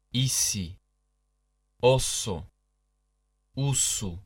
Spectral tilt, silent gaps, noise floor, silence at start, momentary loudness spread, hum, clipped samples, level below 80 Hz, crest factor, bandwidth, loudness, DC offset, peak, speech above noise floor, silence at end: -3.5 dB/octave; none; -74 dBFS; 0.15 s; 14 LU; 50 Hz at -60 dBFS; under 0.1%; -48 dBFS; 20 dB; 17 kHz; -26 LUFS; under 0.1%; -8 dBFS; 47 dB; 0.05 s